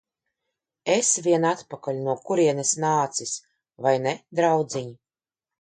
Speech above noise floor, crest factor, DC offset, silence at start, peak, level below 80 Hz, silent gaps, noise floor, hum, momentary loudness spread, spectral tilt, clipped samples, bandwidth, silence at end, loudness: over 67 dB; 18 dB; under 0.1%; 0.85 s; -6 dBFS; -72 dBFS; none; under -90 dBFS; none; 12 LU; -4 dB/octave; under 0.1%; 9.6 kHz; 0.65 s; -24 LUFS